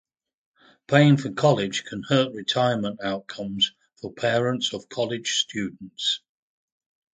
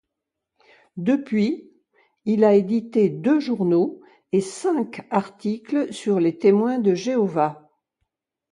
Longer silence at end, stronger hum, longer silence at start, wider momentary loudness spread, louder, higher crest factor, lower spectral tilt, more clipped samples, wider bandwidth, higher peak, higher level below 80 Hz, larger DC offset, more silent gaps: about the same, 1 s vs 0.95 s; neither; about the same, 0.9 s vs 0.95 s; first, 12 LU vs 9 LU; about the same, -24 LUFS vs -22 LUFS; first, 24 dB vs 18 dB; second, -5 dB/octave vs -7 dB/octave; neither; second, 9.4 kHz vs 11.5 kHz; first, -2 dBFS vs -6 dBFS; first, -64 dBFS vs -70 dBFS; neither; neither